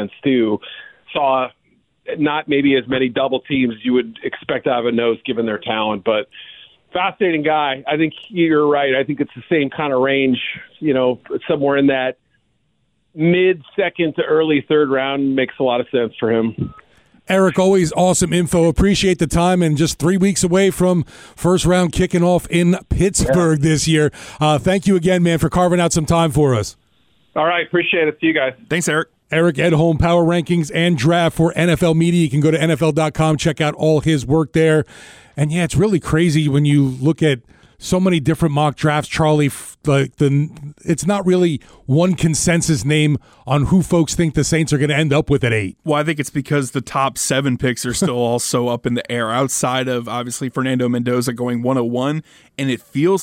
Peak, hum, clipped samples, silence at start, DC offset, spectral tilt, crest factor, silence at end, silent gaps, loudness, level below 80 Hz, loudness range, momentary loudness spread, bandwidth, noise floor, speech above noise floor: -4 dBFS; none; under 0.1%; 0 s; under 0.1%; -5.5 dB/octave; 12 dB; 0 s; none; -17 LUFS; -38 dBFS; 4 LU; 7 LU; 16 kHz; -65 dBFS; 49 dB